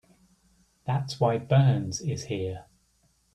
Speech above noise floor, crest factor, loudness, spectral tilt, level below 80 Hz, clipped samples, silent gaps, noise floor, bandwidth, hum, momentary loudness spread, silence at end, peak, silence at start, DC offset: 42 dB; 18 dB; -27 LUFS; -6.5 dB/octave; -60 dBFS; under 0.1%; none; -68 dBFS; 10 kHz; none; 14 LU; 0.75 s; -10 dBFS; 0.85 s; under 0.1%